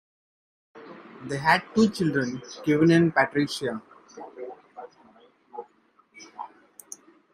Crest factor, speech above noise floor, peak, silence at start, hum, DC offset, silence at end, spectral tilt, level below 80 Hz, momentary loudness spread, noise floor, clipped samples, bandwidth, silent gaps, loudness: 22 dB; 39 dB; -6 dBFS; 0.75 s; none; under 0.1%; 0.85 s; -6 dB/octave; -66 dBFS; 25 LU; -62 dBFS; under 0.1%; 15 kHz; none; -23 LUFS